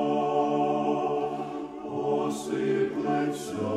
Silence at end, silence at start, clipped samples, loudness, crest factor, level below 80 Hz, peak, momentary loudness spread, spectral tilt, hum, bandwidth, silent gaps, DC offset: 0 s; 0 s; under 0.1%; -28 LUFS; 14 dB; -68 dBFS; -14 dBFS; 8 LU; -6 dB/octave; none; 14.5 kHz; none; under 0.1%